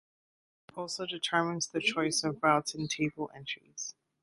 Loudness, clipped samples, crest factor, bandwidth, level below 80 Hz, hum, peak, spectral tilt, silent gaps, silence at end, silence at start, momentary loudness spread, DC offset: -32 LUFS; under 0.1%; 22 dB; 11.5 kHz; -72 dBFS; none; -10 dBFS; -3 dB/octave; none; 0.3 s; 0.75 s; 13 LU; under 0.1%